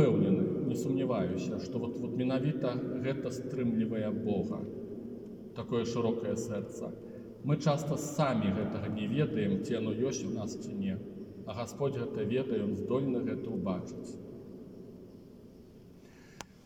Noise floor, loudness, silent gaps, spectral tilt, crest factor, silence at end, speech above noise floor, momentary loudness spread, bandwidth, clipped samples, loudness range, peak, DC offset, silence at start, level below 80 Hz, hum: -54 dBFS; -34 LUFS; none; -7 dB/octave; 18 dB; 0.05 s; 21 dB; 16 LU; 16.5 kHz; under 0.1%; 4 LU; -14 dBFS; under 0.1%; 0 s; -66 dBFS; none